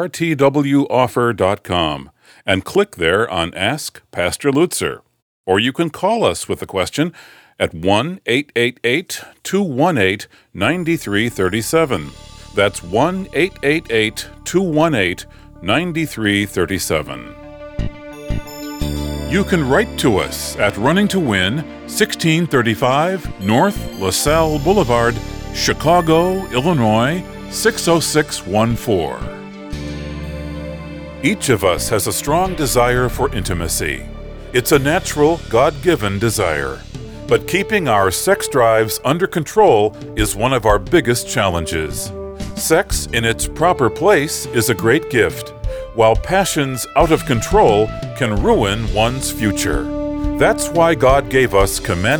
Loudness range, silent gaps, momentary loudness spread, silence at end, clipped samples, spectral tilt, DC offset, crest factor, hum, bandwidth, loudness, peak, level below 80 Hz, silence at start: 4 LU; 5.22-5.44 s; 13 LU; 0 s; under 0.1%; -4.5 dB/octave; under 0.1%; 16 dB; none; over 20 kHz; -16 LUFS; -2 dBFS; -32 dBFS; 0 s